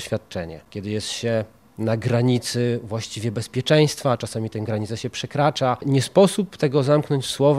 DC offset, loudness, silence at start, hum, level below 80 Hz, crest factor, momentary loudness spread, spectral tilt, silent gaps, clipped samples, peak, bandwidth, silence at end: under 0.1%; -22 LUFS; 0 s; none; -56 dBFS; 18 dB; 11 LU; -5.5 dB/octave; none; under 0.1%; -2 dBFS; 15 kHz; 0 s